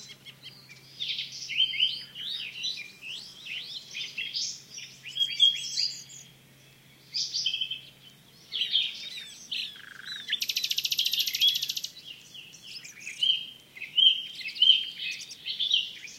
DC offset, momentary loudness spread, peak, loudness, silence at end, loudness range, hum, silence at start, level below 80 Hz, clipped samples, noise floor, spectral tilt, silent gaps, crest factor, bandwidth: under 0.1%; 21 LU; -8 dBFS; -27 LUFS; 0 s; 6 LU; none; 0 s; -78 dBFS; under 0.1%; -56 dBFS; 2 dB/octave; none; 24 dB; 16 kHz